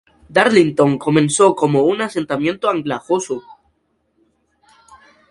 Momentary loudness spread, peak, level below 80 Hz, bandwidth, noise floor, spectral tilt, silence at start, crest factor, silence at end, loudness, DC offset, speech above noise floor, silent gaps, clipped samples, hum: 8 LU; 0 dBFS; -56 dBFS; 11.5 kHz; -65 dBFS; -5 dB/octave; 0.3 s; 18 dB; 1.9 s; -16 LUFS; under 0.1%; 49 dB; none; under 0.1%; none